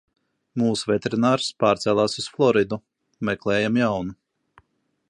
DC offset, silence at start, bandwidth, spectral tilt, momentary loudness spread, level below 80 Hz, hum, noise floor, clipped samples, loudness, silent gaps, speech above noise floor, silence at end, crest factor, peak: under 0.1%; 0.55 s; 11.5 kHz; -5.5 dB/octave; 10 LU; -58 dBFS; none; -67 dBFS; under 0.1%; -22 LUFS; none; 45 dB; 0.95 s; 18 dB; -6 dBFS